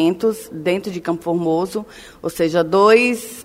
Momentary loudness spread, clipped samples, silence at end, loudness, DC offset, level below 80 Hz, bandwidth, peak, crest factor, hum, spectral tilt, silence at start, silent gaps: 16 LU; under 0.1%; 0 s; -18 LUFS; under 0.1%; -54 dBFS; 16 kHz; 0 dBFS; 18 dB; none; -5.5 dB/octave; 0 s; none